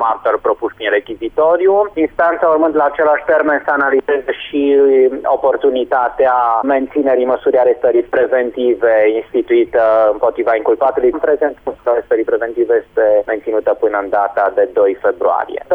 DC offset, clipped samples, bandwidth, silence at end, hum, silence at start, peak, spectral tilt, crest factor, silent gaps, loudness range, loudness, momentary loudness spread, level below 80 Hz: under 0.1%; under 0.1%; 3.9 kHz; 0 s; none; 0 s; -4 dBFS; -7 dB/octave; 10 dB; none; 2 LU; -14 LUFS; 5 LU; -50 dBFS